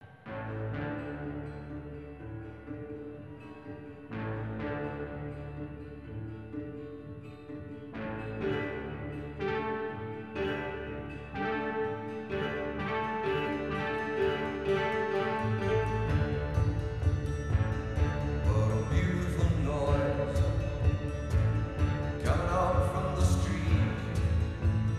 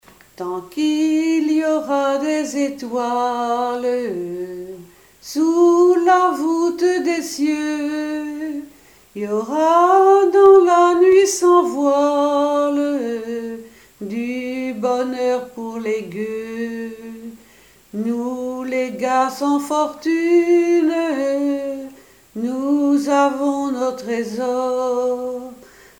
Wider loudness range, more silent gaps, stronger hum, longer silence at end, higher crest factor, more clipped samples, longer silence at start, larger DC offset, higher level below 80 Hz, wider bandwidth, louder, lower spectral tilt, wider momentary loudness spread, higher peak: about the same, 11 LU vs 10 LU; neither; neither; second, 0 s vs 0.45 s; about the same, 18 dB vs 16 dB; neither; second, 0 s vs 0.4 s; first, 0.1% vs under 0.1%; first, -40 dBFS vs -62 dBFS; second, 12 kHz vs 17.5 kHz; second, -32 LUFS vs -18 LUFS; first, -7 dB/octave vs -4.5 dB/octave; about the same, 14 LU vs 16 LU; second, -14 dBFS vs -2 dBFS